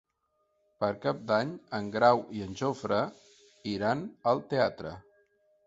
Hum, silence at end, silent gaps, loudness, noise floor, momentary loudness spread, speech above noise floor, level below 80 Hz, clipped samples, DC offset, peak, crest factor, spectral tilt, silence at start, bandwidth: none; 0.65 s; none; -30 LUFS; -76 dBFS; 14 LU; 47 dB; -64 dBFS; under 0.1%; under 0.1%; -10 dBFS; 22 dB; -6 dB/octave; 0.8 s; 8 kHz